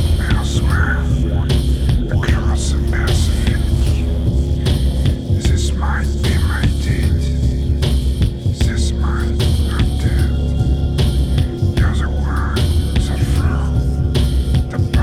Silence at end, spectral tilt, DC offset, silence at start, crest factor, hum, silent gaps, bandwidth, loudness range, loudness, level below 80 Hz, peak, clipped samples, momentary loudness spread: 0 s; -6 dB/octave; under 0.1%; 0 s; 12 dB; none; none; 13.5 kHz; 1 LU; -17 LUFS; -18 dBFS; -2 dBFS; under 0.1%; 2 LU